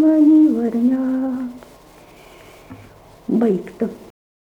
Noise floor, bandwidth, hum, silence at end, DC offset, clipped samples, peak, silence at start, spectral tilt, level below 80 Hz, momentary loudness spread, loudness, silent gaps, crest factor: -45 dBFS; 5.2 kHz; none; 0.45 s; under 0.1%; under 0.1%; -6 dBFS; 0 s; -8.5 dB/octave; -56 dBFS; 15 LU; -17 LUFS; none; 14 dB